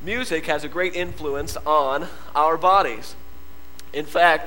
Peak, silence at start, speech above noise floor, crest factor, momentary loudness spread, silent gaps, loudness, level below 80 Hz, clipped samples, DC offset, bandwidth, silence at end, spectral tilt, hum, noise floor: -2 dBFS; 0 s; 24 dB; 20 dB; 13 LU; none; -22 LUFS; -46 dBFS; under 0.1%; 3%; 17 kHz; 0 s; -4 dB/octave; none; -46 dBFS